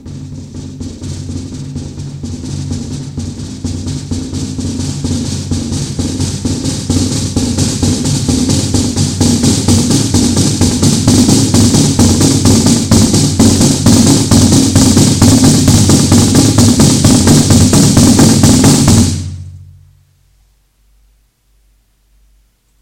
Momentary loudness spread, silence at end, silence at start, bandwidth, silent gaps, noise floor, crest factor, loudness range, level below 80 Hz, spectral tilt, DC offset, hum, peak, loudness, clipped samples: 16 LU; 3.15 s; 0.05 s; 17 kHz; none; -53 dBFS; 10 dB; 14 LU; -28 dBFS; -4.5 dB/octave; under 0.1%; none; 0 dBFS; -9 LUFS; 0.6%